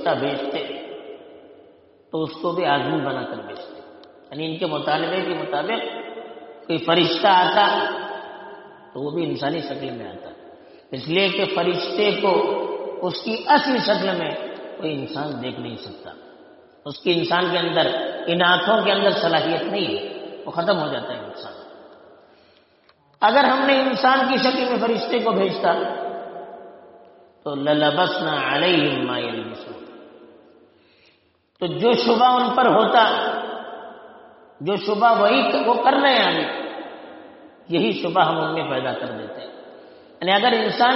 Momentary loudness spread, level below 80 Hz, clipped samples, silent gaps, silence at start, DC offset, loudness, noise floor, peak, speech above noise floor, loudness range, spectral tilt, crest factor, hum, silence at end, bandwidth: 20 LU; -68 dBFS; under 0.1%; none; 0 s; under 0.1%; -20 LUFS; -61 dBFS; -4 dBFS; 41 dB; 7 LU; -2 dB/octave; 18 dB; none; 0 s; 6 kHz